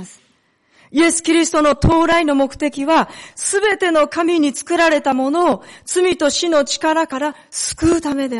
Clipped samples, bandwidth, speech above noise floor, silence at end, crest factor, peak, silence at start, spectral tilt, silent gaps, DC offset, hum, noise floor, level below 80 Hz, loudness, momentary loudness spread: under 0.1%; 11.5 kHz; 43 dB; 0 s; 12 dB; -4 dBFS; 0 s; -4 dB/octave; none; under 0.1%; none; -59 dBFS; -38 dBFS; -16 LUFS; 8 LU